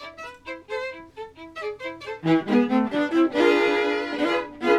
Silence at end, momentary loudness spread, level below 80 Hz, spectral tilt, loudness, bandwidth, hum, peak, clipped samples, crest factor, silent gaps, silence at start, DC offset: 0 s; 19 LU; -62 dBFS; -6 dB/octave; -23 LUFS; 11 kHz; none; -8 dBFS; under 0.1%; 16 dB; none; 0 s; under 0.1%